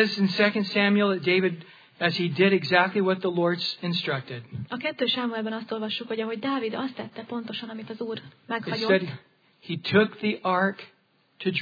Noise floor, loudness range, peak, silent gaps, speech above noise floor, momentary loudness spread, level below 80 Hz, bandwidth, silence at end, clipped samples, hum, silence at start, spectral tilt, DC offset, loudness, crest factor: -48 dBFS; 7 LU; -6 dBFS; none; 22 dB; 14 LU; -76 dBFS; 5 kHz; 0 s; under 0.1%; none; 0 s; -7 dB/octave; under 0.1%; -26 LUFS; 20 dB